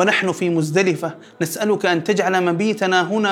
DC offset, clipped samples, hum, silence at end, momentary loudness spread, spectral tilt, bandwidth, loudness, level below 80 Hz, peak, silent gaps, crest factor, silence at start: under 0.1%; under 0.1%; none; 0 s; 8 LU; -5 dB/octave; 17 kHz; -19 LUFS; -72 dBFS; -2 dBFS; none; 16 dB; 0 s